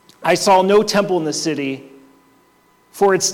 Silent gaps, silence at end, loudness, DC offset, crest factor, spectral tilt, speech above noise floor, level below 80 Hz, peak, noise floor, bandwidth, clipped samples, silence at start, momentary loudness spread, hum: none; 0 s; -16 LUFS; under 0.1%; 14 dB; -3.5 dB/octave; 39 dB; -58 dBFS; -4 dBFS; -55 dBFS; 16.5 kHz; under 0.1%; 0.2 s; 11 LU; none